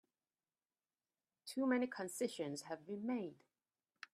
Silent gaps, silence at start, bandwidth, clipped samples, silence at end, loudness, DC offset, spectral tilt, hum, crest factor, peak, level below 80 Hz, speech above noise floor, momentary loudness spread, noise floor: none; 1.45 s; 14 kHz; under 0.1%; 0.8 s; -42 LUFS; under 0.1%; -4.5 dB/octave; none; 20 dB; -24 dBFS; under -90 dBFS; over 49 dB; 13 LU; under -90 dBFS